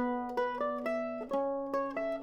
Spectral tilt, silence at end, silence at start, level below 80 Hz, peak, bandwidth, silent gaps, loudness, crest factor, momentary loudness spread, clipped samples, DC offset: -6 dB/octave; 0 s; 0 s; -66 dBFS; -20 dBFS; 13.5 kHz; none; -34 LUFS; 14 dB; 2 LU; under 0.1%; under 0.1%